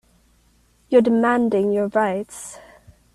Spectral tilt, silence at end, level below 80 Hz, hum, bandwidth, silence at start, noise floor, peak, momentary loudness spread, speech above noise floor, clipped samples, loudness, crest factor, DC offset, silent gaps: -6 dB/octave; 0.55 s; -58 dBFS; none; 12.5 kHz; 0.9 s; -59 dBFS; -4 dBFS; 17 LU; 40 dB; under 0.1%; -19 LUFS; 18 dB; under 0.1%; none